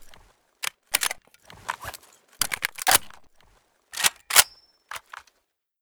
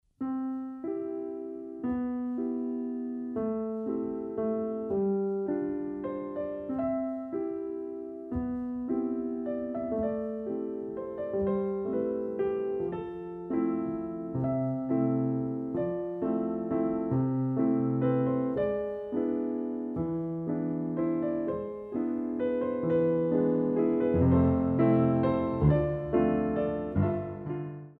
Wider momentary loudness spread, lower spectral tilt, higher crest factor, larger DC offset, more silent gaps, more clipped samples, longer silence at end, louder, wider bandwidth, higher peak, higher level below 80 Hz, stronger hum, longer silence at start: first, 22 LU vs 10 LU; second, 1.5 dB/octave vs -12 dB/octave; first, 28 dB vs 18 dB; neither; neither; neither; first, 0.85 s vs 0.05 s; first, -23 LUFS vs -31 LUFS; first, over 20 kHz vs 4 kHz; first, 0 dBFS vs -12 dBFS; second, -60 dBFS vs -52 dBFS; neither; second, 0 s vs 0.2 s